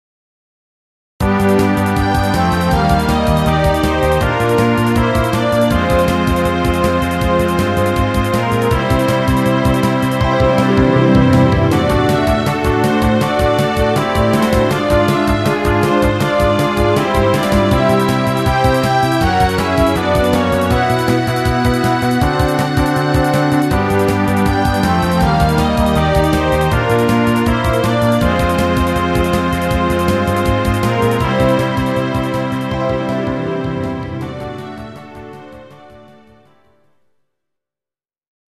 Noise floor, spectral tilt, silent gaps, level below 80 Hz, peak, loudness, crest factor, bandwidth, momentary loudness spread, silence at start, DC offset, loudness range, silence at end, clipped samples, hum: under -90 dBFS; -6.5 dB/octave; none; -26 dBFS; 0 dBFS; -14 LUFS; 14 dB; 15.5 kHz; 4 LU; 1.2 s; 0.3%; 4 LU; 2.5 s; under 0.1%; none